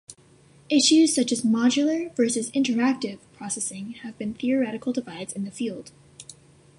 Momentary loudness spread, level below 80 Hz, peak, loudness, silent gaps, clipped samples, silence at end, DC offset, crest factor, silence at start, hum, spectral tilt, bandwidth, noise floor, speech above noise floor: 19 LU; -66 dBFS; -8 dBFS; -24 LUFS; none; under 0.1%; 0.45 s; under 0.1%; 16 dB; 0.1 s; none; -3 dB/octave; 11.5 kHz; -55 dBFS; 31 dB